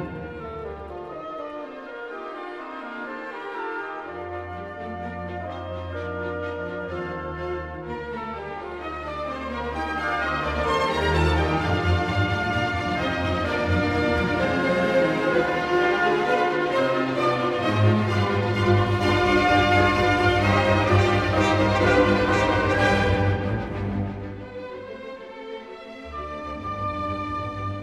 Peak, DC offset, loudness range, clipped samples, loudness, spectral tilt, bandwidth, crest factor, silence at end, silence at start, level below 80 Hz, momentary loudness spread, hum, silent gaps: -6 dBFS; under 0.1%; 14 LU; under 0.1%; -23 LUFS; -6.5 dB/octave; 11.5 kHz; 18 dB; 0 s; 0 s; -40 dBFS; 15 LU; none; none